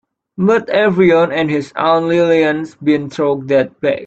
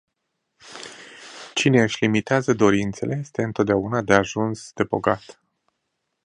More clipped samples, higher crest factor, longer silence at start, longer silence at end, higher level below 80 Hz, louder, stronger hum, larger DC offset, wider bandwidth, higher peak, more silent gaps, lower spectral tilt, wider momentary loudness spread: neither; second, 14 dB vs 22 dB; second, 0.4 s vs 0.65 s; second, 0 s vs 1.05 s; about the same, -54 dBFS vs -54 dBFS; first, -14 LUFS vs -21 LUFS; neither; neither; second, 8.2 kHz vs 10.5 kHz; about the same, 0 dBFS vs 0 dBFS; neither; first, -7 dB/octave vs -5.5 dB/octave; second, 7 LU vs 20 LU